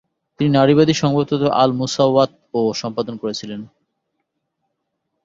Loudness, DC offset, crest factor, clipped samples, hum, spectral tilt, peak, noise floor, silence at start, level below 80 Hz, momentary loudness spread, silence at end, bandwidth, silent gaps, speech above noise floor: -17 LUFS; under 0.1%; 18 dB; under 0.1%; none; -6 dB/octave; -2 dBFS; -75 dBFS; 0.4 s; -56 dBFS; 12 LU; 1.6 s; 7.8 kHz; none; 58 dB